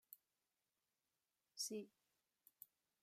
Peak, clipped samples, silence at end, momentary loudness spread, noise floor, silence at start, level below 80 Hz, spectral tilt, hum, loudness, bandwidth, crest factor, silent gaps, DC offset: -34 dBFS; under 0.1%; 0.35 s; 17 LU; under -90 dBFS; 0.1 s; under -90 dBFS; -2 dB/octave; none; -50 LUFS; 15 kHz; 24 dB; none; under 0.1%